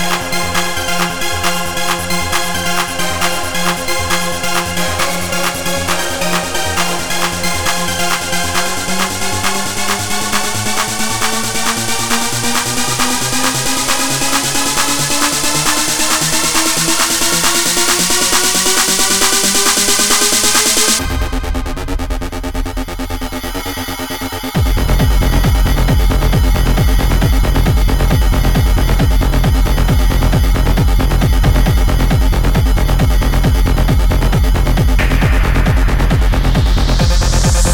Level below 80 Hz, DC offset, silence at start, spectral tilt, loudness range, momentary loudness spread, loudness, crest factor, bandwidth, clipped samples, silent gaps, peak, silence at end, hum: -16 dBFS; under 0.1%; 0 s; -3 dB/octave; 5 LU; 6 LU; -14 LUFS; 14 dB; over 20 kHz; under 0.1%; none; 0 dBFS; 0 s; none